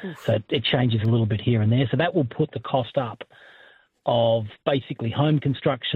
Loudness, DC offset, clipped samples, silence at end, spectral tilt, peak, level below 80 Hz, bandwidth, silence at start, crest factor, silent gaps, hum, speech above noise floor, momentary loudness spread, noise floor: -23 LUFS; under 0.1%; under 0.1%; 0 s; -8.5 dB/octave; -6 dBFS; -58 dBFS; 4.6 kHz; 0 s; 16 dB; none; none; 31 dB; 7 LU; -54 dBFS